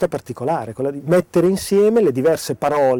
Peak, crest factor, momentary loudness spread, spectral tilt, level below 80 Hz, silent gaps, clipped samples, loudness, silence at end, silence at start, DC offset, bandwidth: -6 dBFS; 10 dB; 9 LU; -6 dB/octave; -52 dBFS; none; under 0.1%; -18 LUFS; 0 s; 0 s; under 0.1%; 19 kHz